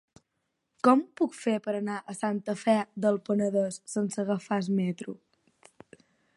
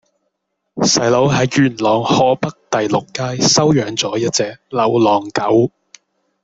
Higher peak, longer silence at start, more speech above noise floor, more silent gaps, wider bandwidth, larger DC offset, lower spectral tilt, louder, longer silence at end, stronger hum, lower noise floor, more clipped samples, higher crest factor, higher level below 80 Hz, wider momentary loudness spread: second, -8 dBFS vs -2 dBFS; about the same, 0.85 s vs 0.75 s; second, 52 dB vs 57 dB; neither; first, 11.5 kHz vs 8.2 kHz; neither; first, -6 dB/octave vs -4.5 dB/octave; second, -29 LUFS vs -15 LUFS; first, 1.25 s vs 0.75 s; neither; first, -80 dBFS vs -72 dBFS; neither; first, 22 dB vs 14 dB; second, -78 dBFS vs -52 dBFS; about the same, 9 LU vs 7 LU